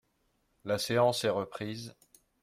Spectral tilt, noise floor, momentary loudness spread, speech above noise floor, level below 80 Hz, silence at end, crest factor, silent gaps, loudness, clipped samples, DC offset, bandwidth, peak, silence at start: -4.5 dB/octave; -75 dBFS; 17 LU; 44 dB; -70 dBFS; 0.55 s; 18 dB; none; -31 LUFS; under 0.1%; under 0.1%; 15.5 kHz; -14 dBFS; 0.65 s